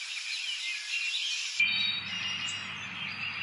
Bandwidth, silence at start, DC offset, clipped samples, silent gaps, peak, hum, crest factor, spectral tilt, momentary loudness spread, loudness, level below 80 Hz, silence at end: 11.5 kHz; 0 s; under 0.1%; under 0.1%; none; -16 dBFS; none; 18 dB; 0.5 dB/octave; 10 LU; -30 LUFS; -80 dBFS; 0 s